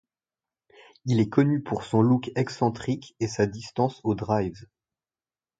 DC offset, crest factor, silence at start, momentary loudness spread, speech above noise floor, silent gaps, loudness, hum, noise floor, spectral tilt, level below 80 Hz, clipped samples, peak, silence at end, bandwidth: under 0.1%; 20 dB; 1.05 s; 9 LU; over 65 dB; none; -26 LUFS; none; under -90 dBFS; -7.5 dB/octave; -56 dBFS; under 0.1%; -6 dBFS; 1 s; 9 kHz